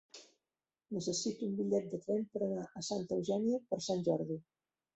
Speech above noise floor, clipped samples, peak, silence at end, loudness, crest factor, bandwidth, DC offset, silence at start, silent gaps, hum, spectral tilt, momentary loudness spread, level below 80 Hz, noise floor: over 54 dB; under 0.1%; -20 dBFS; 0.55 s; -37 LUFS; 18 dB; 8.2 kHz; under 0.1%; 0.15 s; none; none; -5.5 dB/octave; 8 LU; -76 dBFS; under -90 dBFS